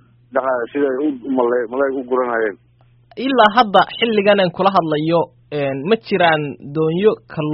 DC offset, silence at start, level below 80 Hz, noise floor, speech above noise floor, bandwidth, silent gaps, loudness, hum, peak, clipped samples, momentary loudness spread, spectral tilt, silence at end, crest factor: under 0.1%; 0.35 s; -58 dBFS; -50 dBFS; 34 dB; 5.8 kHz; none; -17 LUFS; none; 0 dBFS; under 0.1%; 10 LU; -3.5 dB/octave; 0 s; 18 dB